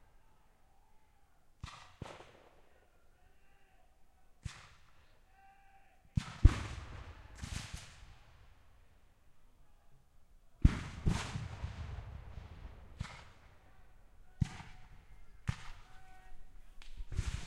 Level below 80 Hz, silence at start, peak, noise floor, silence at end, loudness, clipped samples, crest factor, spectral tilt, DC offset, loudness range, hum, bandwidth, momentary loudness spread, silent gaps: -42 dBFS; 0 s; -8 dBFS; -65 dBFS; 0 s; -40 LUFS; under 0.1%; 32 dB; -6 dB/octave; under 0.1%; 18 LU; none; 12 kHz; 27 LU; none